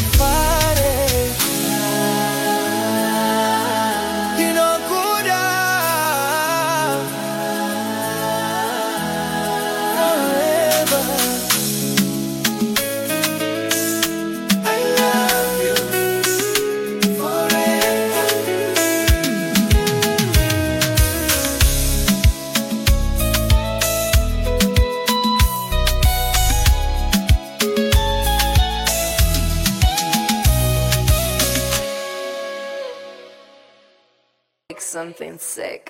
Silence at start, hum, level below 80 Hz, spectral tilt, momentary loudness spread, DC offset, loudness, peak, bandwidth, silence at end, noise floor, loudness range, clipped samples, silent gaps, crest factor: 0 s; none; -24 dBFS; -3.5 dB/octave; 6 LU; under 0.1%; -18 LUFS; -2 dBFS; 16.5 kHz; 0 s; -67 dBFS; 3 LU; under 0.1%; none; 16 dB